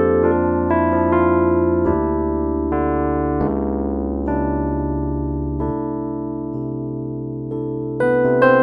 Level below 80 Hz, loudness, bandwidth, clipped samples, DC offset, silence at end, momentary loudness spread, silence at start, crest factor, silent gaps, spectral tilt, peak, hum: -32 dBFS; -20 LUFS; 4.7 kHz; under 0.1%; under 0.1%; 0 s; 10 LU; 0 s; 18 dB; none; -10.5 dB/octave; -2 dBFS; none